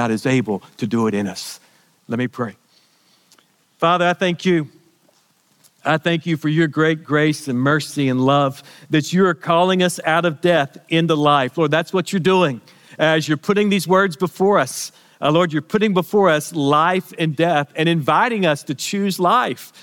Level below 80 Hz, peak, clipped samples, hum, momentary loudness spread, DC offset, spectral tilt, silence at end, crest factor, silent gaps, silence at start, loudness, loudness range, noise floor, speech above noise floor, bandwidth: -68 dBFS; -2 dBFS; under 0.1%; none; 8 LU; under 0.1%; -5.5 dB/octave; 0.15 s; 16 dB; none; 0 s; -18 LUFS; 5 LU; -59 dBFS; 42 dB; 18 kHz